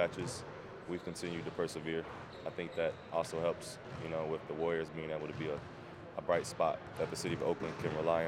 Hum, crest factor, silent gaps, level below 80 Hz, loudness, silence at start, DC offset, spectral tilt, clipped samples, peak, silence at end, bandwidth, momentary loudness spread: none; 20 dB; none; -64 dBFS; -39 LUFS; 0 s; under 0.1%; -5 dB/octave; under 0.1%; -18 dBFS; 0 s; 16 kHz; 10 LU